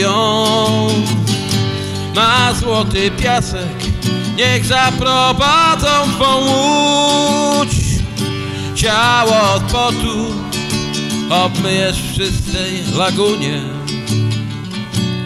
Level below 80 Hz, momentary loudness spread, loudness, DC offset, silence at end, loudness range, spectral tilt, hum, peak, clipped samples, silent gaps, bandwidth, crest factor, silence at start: -30 dBFS; 9 LU; -14 LUFS; under 0.1%; 0 s; 4 LU; -4 dB/octave; none; 0 dBFS; under 0.1%; none; 15 kHz; 14 dB; 0 s